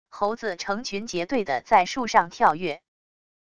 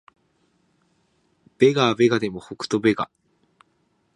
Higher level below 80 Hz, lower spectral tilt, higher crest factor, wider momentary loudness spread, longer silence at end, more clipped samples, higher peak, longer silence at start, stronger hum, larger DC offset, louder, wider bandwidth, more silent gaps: about the same, -60 dBFS vs -62 dBFS; second, -3.5 dB/octave vs -5.5 dB/octave; about the same, 20 dB vs 20 dB; second, 9 LU vs 13 LU; second, 0.65 s vs 1.1 s; neither; about the same, -4 dBFS vs -4 dBFS; second, 0.05 s vs 1.6 s; neither; first, 0.4% vs under 0.1%; second, -24 LUFS vs -21 LUFS; about the same, 11 kHz vs 11 kHz; neither